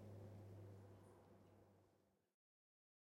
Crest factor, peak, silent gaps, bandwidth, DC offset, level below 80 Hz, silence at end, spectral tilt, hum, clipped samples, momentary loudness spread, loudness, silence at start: 16 dB; -48 dBFS; none; 16 kHz; under 0.1%; -86 dBFS; 0.85 s; -8 dB/octave; none; under 0.1%; 9 LU; -63 LUFS; 0 s